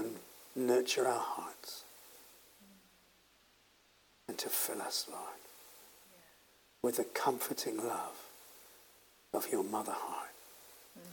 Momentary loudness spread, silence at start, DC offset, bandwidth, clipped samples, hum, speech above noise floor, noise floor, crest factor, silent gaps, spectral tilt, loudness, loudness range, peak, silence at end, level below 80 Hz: 23 LU; 0 s; under 0.1%; 18 kHz; under 0.1%; none; 32 dB; -68 dBFS; 24 dB; none; -2.5 dB/octave; -37 LUFS; 4 LU; -16 dBFS; 0 s; -82 dBFS